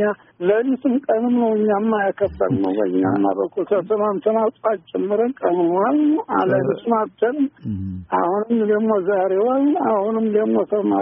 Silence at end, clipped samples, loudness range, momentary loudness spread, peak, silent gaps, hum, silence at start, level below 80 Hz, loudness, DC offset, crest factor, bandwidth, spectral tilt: 0 s; under 0.1%; 1 LU; 5 LU; -4 dBFS; none; none; 0 s; -54 dBFS; -19 LUFS; under 0.1%; 14 dB; 3.8 kHz; -3.5 dB/octave